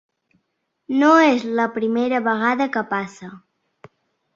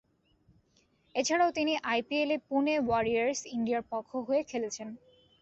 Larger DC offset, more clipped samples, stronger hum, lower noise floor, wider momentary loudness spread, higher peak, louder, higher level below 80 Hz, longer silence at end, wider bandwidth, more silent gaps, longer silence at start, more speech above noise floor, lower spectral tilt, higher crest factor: neither; neither; neither; first, -74 dBFS vs -69 dBFS; first, 15 LU vs 10 LU; first, -2 dBFS vs -16 dBFS; first, -18 LUFS vs -31 LUFS; about the same, -68 dBFS vs -66 dBFS; first, 0.95 s vs 0.45 s; about the same, 7.6 kHz vs 8.2 kHz; neither; second, 0.9 s vs 1.15 s; first, 55 dB vs 39 dB; first, -5 dB/octave vs -3.5 dB/octave; about the same, 18 dB vs 16 dB